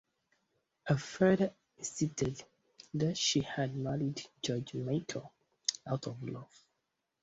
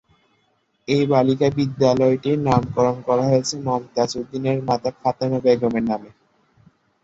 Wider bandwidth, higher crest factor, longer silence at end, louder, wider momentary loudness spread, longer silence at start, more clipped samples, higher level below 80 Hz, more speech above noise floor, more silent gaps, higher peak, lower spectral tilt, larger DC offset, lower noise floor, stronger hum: about the same, 8.2 kHz vs 8 kHz; first, 24 dB vs 18 dB; second, 0.8 s vs 0.95 s; second, -35 LUFS vs -20 LUFS; first, 14 LU vs 7 LU; about the same, 0.85 s vs 0.9 s; neither; second, -66 dBFS vs -52 dBFS; first, 50 dB vs 46 dB; neither; second, -12 dBFS vs -4 dBFS; second, -4.5 dB/octave vs -6.5 dB/octave; neither; first, -84 dBFS vs -66 dBFS; neither